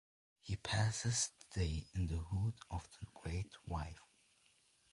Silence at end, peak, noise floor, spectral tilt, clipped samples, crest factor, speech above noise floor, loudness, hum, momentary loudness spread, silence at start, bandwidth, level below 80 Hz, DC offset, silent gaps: 0.95 s; -22 dBFS; -73 dBFS; -4 dB/octave; under 0.1%; 20 dB; 33 dB; -41 LUFS; none; 14 LU; 0.45 s; 11.5 kHz; -50 dBFS; under 0.1%; none